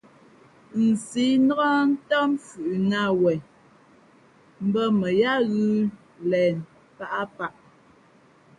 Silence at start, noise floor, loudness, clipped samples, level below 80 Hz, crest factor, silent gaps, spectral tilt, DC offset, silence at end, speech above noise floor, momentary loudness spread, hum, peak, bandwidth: 0.75 s; -56 dBFS; -24 LUFS; under 0.1%; -66 dBFS; 16 dB; none; -6 dB/octave; under 0.1%; 1.1 s; 34 dB; 12 LU; none; -10 dBFS; 11.5 kHz